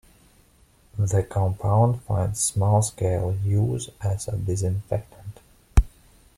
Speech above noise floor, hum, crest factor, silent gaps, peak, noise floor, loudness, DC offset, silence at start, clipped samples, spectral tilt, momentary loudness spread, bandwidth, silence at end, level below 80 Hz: 35 dB; none; 20 dB; none; -4 dBFS; -57 dBFS; -24 LUFS; under 0.1%; 0.95 s; under 0.1%; -6 dB/octave; 10 LU; 14.5 kHz; 0.5 s; -34 dBFS